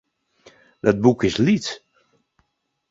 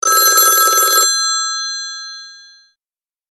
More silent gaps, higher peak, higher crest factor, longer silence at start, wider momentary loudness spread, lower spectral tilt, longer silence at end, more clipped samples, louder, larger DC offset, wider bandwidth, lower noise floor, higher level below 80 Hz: neither; about the same, -2 dBFS vs 0 dBFS; about the same, 20 dB vs 16 dB; first, 0.85 s vs 0.05 s; second, 12 LU vs 19 LU; first, -6 dB/octave vs 3.5 dB/octave; first, 1.15 s vs 0.95 s; neither; second, -20 LUFS vs -11 LUFS; neither; second, 7.8 kHz vs 16 kHz; second, -72 dBFS vs under -90 dBFS; first, -52 dBFS vs -70 dBFS